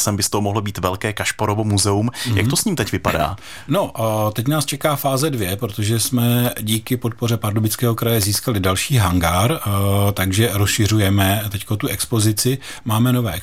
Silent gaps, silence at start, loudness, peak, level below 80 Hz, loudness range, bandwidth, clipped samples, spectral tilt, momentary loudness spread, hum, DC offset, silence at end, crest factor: none; 0 s; -19 LUFS; -2 dBFS; -44 dBFS; 2 LU; 16.5 kHz; under 0.1%; -4.5 dB/octave; 5 LU; none; 0.8%; 0 s; 18 dB